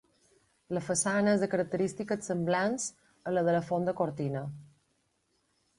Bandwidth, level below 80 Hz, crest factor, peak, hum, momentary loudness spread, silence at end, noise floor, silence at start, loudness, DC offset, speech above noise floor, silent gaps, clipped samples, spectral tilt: 11.5 kHz; -68 dBFS; 18 dB; -14 dBFS; none; 11 LU; 1.15 s; -75 dBFS; 0.7 s; -31 LUFS; under 0.1%; 45 dB; none; under 0.1%; -5 dB/octave